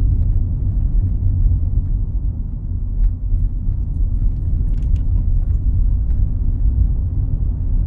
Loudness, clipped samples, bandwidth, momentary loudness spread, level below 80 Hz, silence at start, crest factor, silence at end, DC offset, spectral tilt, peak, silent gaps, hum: -21 LUFS; under 0.1%; 1.2 kHz; 5 LU; -18 dBFS; 0 s; 12 dB; 0 s; under 0.1%; -12 dB/octave; -4 dBFS; none; none